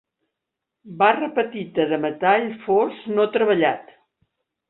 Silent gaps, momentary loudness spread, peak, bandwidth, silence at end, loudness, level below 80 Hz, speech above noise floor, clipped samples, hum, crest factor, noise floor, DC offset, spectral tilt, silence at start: none; 6 LU; -2 dBFS; 4.1 kHz; 0.85 s; -21 LUFS; -68 dBFS; 63 dB; under 0.1%; none; 20 dB; -83 dBFS; under 0.1%; -10 dB/octave; 0.85 s